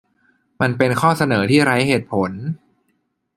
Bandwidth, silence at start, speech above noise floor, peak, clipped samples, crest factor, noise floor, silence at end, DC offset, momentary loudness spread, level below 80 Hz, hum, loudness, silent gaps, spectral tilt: 14.5 kHz; 0.6 s; 51 dB; 0 dBFS; under 0.1%; 18 dB; -68 dBFS; 0.8 s; under 0.1%; 13 LU; -56 dBFS; none; -17 LUFS; none; -6 dB/octave